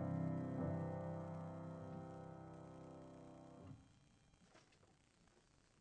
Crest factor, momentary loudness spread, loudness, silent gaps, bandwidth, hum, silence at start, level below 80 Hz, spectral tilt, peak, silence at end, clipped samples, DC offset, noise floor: 18 dB; 19 LU; -49 LUFS; none; 9.2 kHz; none; 0 s; -74 dBFS; -9 dB/octave; -32 dBFS; 0.4 s; under 0.1%; under 0.1%; -74 dBFS